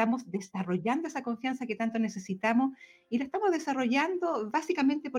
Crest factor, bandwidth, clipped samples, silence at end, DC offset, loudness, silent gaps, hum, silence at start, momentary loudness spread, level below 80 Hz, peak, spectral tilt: 16 dB; 11.5 kHz; under 0.1%; 0 s; under 0.1%; -31 LUFS; none; none; 0 s; 6 LU; -78 dBFS; -14 dBFS; -5.5 dB/octave